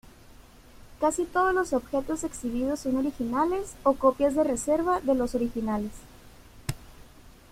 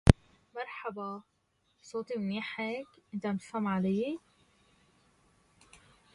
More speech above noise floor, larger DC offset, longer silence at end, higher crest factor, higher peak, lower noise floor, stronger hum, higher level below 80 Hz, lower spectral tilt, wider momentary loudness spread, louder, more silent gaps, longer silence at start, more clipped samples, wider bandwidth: second, 25 dB vs 35 dB; neither; second, 0.2 s vs 1.95 s; second, 20 dB vs 34 dB; second, -8 dBFS vs 0 dBFS; second, -51 dBFS vs -70 dBFS; neither; second, -48 dBFS vs -42 dBFS; second, -5 dB/octave vs -7 dB/octave; about the same, 11 LU vs 12 LU; first, -27 LUFS vs -35 LUFS; neither; first, 0.3 s vs 0.05 s; neither; first, 16.5 kHz vs 11.5 kHz